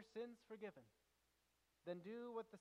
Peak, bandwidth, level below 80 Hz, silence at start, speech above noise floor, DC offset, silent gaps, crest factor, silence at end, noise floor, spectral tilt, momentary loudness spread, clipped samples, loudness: -38 dBFS; 12.5 kHz; under -90 dBFS; 0 s; 30 dB; under 0.1%; none; 18 dB; 0 s; -84 dBFS; -6.5 dB/octave; 5 LU; under 0.1%; -55 LUFS